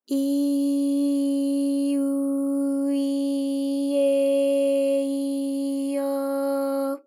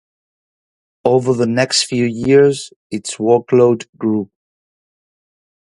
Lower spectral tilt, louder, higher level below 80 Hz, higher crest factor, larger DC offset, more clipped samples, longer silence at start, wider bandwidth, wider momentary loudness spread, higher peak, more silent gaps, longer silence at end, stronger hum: about the same, -4 dB/octave vs -5 dB/octave; second, -24 LUFS vs -15 LUFS; second, under -90 dBFS vs -56 dBFS; second, 10 dB vs 16 dB; neither; neither; second, 0.1 s vs 1.05 s; first, 15 kHz vs 11.5 kHz; second, 5 LU vs 14 LU; second, -14 dBFS vs 0 dBFS; second, none vs 2.76-2.90 s, 3.89-3.93 s; second, 0.05 s vs 1.5 s; neither